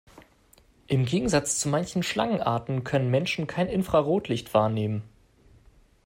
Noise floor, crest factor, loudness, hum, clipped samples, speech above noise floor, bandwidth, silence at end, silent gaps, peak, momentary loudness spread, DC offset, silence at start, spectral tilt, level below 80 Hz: -59 dBFS; 20 dB; -26 LUFS; none; under 0.1%; 34 dB; 16 kHz; 0.95 s; none; -8 dBFS; 5 LU; under 0.1%; 0.15 s; -5 dB/octave; -52 dBFS